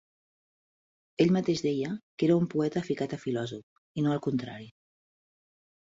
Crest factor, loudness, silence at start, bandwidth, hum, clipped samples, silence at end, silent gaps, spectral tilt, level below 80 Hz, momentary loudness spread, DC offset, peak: 20 dB; -29 LUFS; 1.2 s; 7.8 kHz; none; under 0.1%; 1.25 s; 2.03-2.18 s, 3.63-3.95 s; -7 dB/octave; -68 dBFS; 16 LU; under 0.1%; -10 dBFS